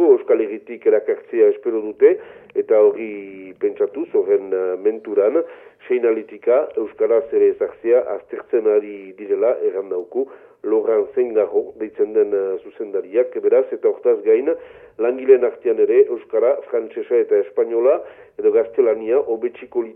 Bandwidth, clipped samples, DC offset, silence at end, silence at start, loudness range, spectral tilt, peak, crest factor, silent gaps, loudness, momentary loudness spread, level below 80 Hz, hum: 3.4 kHz; under 0.1%; under 0.1%; 0.05 s; 0 s; 3 LU; -9 dB/octave; -2 dBFS; 16 dB; none; -19 LUFS; 10 LU; -68 dBFS; none